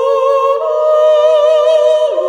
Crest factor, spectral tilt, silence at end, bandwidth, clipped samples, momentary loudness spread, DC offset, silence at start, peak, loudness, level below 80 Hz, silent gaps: 10 dB; -2 dB/octave; 0 s; 9.4 kHz; under 0.1%; 4 LU; under 0.1%; 0 s; -2 dBFS; -10 LUFS; -60 dBFS; none